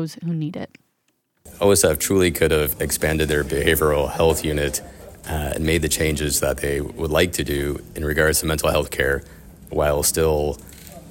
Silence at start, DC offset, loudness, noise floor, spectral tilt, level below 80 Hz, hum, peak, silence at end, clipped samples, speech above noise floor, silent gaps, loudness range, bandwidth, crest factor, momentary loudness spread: 0 s; under 0.1%; -20 LUFS; -69 dBFS; -4 dB/octave; -34 dBFS; none; -4 dBFS; 0 s; under 0.1%; 49 dB; none; 3 LU; 17 kHz; 18 dB; 11 LU